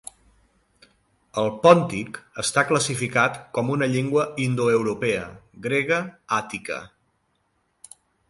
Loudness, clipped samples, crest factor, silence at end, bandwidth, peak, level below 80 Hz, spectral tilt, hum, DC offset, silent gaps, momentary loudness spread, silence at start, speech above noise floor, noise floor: -23 LUFS; under 0.1%; 22 dB; 1.4 s; 11.5 kHz; -2 dBFS; -60 dBFS; -4.5 dB/octave; none; under 0.1%; none; 14 LU; 1.35 s; 47 dB; -70 dBFS